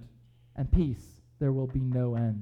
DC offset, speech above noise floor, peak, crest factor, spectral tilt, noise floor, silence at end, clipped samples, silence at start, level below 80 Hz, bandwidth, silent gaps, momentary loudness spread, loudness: under 0.1%; 29 dB; -12 dBFS; 18 dB; -10 dB/octave; -57 dBFS; 0 s; under 0.1%; 0 s; -36 dBFS; 6.4 kHz; none; 10 LU; -30 LUFS